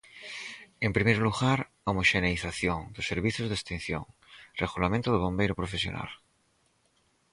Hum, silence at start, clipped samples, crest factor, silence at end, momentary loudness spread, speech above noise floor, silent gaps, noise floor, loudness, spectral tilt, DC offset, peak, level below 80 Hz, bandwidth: none; 0.15 s; under 0.1%; 22 dB; 1.15 s; 15 LU; 41 dB; none; -70 dBFS; -29 LUFS; -5.5 dB/octave; under 0.1%; -8 dBFS; -48 dBFS; 11.5 kHz